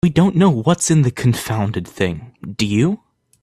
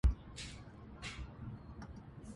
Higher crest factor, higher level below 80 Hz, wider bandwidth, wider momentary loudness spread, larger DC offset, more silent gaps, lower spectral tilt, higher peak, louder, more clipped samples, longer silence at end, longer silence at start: second, 16 dB vs 22 dB; about the same, -46 dBFS vs -42 dBFS; first, 14.5 kHz vs 11.5 kHz; first, 10 LU vs 7 LU; neither; neither; about the same, -6 dB/octave vs -5.5 dB/octave; first, -2 dBFS vs -18 dBFS; first, -17 LUFS vs -47 LUFS; neither; first, 0.45 s vs 0 s; about the same, 0.05 s vs 0.05 s